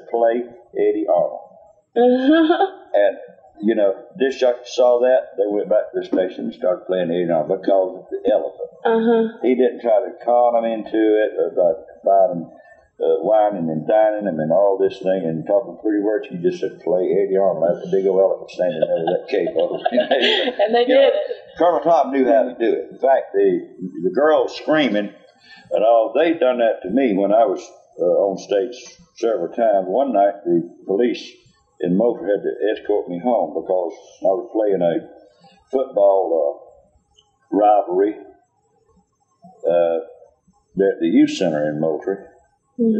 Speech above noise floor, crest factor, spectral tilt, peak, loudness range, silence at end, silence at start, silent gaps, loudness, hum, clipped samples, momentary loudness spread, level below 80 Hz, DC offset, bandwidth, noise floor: 44 dB; 14 dB; -6 dB/octave; -4 dBFS; 4 LU; 0 s; 0.05 s; none; -19 LUFS; none; under 0.1%; 9 LU; -66 dBFS; under 0.1%; 7.8 kHz; -62 dBFS